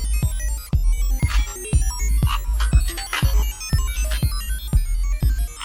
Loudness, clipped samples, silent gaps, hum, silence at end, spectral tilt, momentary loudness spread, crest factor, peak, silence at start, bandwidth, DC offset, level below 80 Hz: -23 LUFS; under 0.1%; none; none; 0 s; -4 dB/octave; 4 LU; 14 dB; -6 dBFS; 0 s; 16.5 kHz; under 0.1%; -20 dBFS